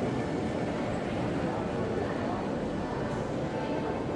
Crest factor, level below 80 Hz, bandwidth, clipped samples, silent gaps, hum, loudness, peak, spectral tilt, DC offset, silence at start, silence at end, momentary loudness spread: 12 dB; -50 dBFS; 11.5 kHz; under 0.1%; none; none; -32 LUFS; -20 dBFS; -7 dB/octave; under 0.1%; 0 s; 0 s; 2 LU